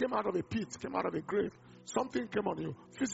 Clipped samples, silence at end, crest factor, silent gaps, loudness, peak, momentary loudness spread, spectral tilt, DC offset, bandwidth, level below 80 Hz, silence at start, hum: under 0.1%; 0 s; 18 dB; none; -36 LUFS; -16 dBFS; 6 LU; -5 dB/octave; under 0.1%; 8 kHz; -68 dBFS; 0 s; none